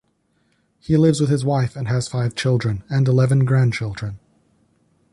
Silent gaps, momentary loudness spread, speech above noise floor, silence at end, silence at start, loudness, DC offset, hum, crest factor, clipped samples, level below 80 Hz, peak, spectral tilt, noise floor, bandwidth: none; 10 LU; 47 dB; 0.95 s; 0.9 s; -19 LUFS; under 0.1%; none; 16 dB; under 0.1%; -48 dBFS; -4 dBFS; -7 dB/octave; -65 dBFS; 11.5 kHz